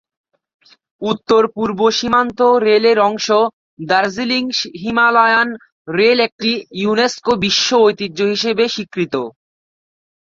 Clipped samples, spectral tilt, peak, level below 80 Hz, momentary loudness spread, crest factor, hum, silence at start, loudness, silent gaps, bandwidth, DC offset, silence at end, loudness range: under 0.1%; -3.5 dB/octave; -2 dBFS; -54 dBFS; 9 LU; 14 dB; none; 1 s; -15 LUFS; 3.53-3.77 s, 5.72-5.85 s, 6.32-6.39 s; 7.6 kHz; under 0.1%; 1.05 s; 2 LU